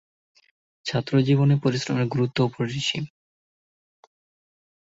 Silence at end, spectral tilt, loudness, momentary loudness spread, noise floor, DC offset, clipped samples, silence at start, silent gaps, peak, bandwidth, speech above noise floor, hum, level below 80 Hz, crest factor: 1.85 s; -6 dB/octave; -23 LUFS; 11 LU; under -90 dBFS; under 0.1%; under 0.1%; 0.85 s; none; -8 dBFS; 8 kHz; over 68 dB; none; -62 dBFS; 18 dB